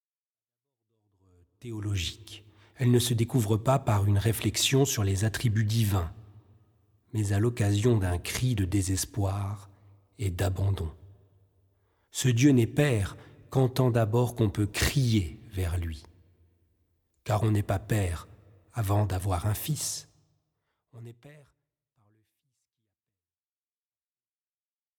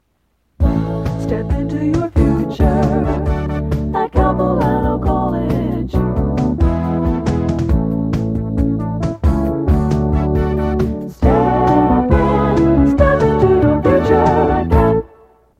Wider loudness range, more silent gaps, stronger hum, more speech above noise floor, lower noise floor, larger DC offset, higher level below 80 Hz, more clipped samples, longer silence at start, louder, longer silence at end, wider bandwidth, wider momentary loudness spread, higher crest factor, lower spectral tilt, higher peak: about the same, 7 LU vs 5 LU; neither; neither; first, over 63 dB vs 48 dB; first, under -90 dBFS vs -63 dBFS; neither; second, -48 dBFS vs -22 dBFS; neither; first, 1.65 s vs 0.6 s; second, -28 LUFS vs -16 LUFS; first, 3.7 s vs 0.55 s; first, 19 kHz vs 8.4 kHz; first, 15 LU vs 7 LU; first, 20 dB vs 14 dB; second, -5.5 dB/octave vs -9 dB/octave; second, -10 dBFS vs 0 dBFS